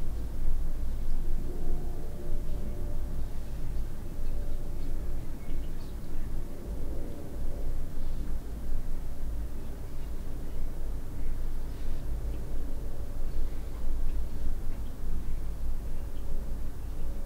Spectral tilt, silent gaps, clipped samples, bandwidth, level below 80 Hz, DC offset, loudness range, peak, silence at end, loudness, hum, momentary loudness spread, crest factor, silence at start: -7 dB/octave; none; under 0.1%; 2.5 kHz; -30 dBFS; under 0.1%; 2 LU; -14 dBFS; 0 s; -39 LUFS; none; 4 LU; 12 dB; 0 s